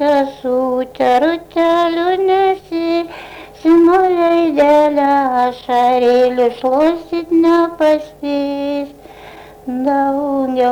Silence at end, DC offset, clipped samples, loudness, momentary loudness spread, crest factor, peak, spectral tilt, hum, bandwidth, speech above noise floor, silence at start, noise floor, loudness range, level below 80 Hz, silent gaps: 0 s; under 0.1%; under 0.1%; -14 LUFS; 9 LU; 10 dB; -4 dBFS; -5.5 dB/octave; none; 11 kHz; 22 dB; 0 s; -36 dBFS; 4 LU; -50 dBFS; none